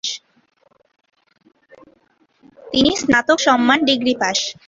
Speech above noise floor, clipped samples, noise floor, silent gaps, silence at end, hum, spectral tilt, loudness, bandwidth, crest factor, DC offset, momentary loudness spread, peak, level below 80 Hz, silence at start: 43 dB; under 0.1%; -60 dBFS; none; 0.15 s; none; -2.5 dB/octave; -16 LUFS; 7.8 kHz; 18 dB; under 0.1%; 8 LU; -2 dBFS; -52 dBFS; 0.05 s